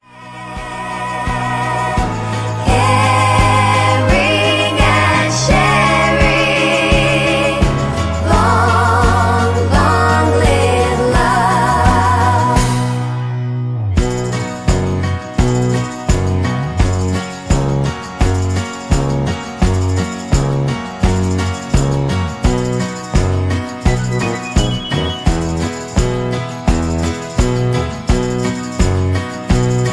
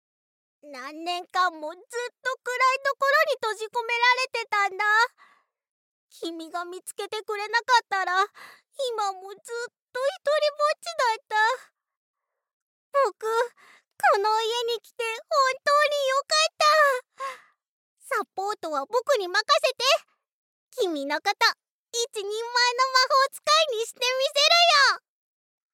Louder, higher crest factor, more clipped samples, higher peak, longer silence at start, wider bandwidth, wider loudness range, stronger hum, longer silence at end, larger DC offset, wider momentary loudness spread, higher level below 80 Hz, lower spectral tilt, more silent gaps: first, -15 LUFS vs -24 LUFS; about the same, 14 dB vs 18 dB; neither; first, 0 dBFS vs -8 dBFS; second, 0.15 s vs 0.65 s; second, 11 kHz vs 17 kHz; about the same, 6 LU vs 5 LU; neither; second, 0 s vs 0.75 s; neither; second, 8 LU vs 15 LU; first, -22 dBFS vs under -90 dBFS; first, -5.5 dB/octave vs 1.5 dB/octave; second, none vs 5.71-6.09 s, 9.82-9.88 s, 11.97-12.14 s, 12.53-12.92 s, 17.68-17.97 s, 20.32-20.67 s, 21.71-21.86 s